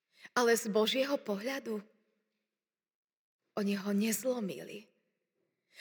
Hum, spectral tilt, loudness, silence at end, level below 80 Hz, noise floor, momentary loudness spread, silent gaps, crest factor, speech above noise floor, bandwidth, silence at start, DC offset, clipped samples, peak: none; -4 dB/octave; -33 LUFS; 0 s; under -90 dBFS; under -90 dBFS; 14 LU; 2.95-3.08 s, 3.17-3.39 s; 20 dB; over 57 dB; over 20 kHz; 0.25 s; under 0.1%; under 0.1%; -16 dBFS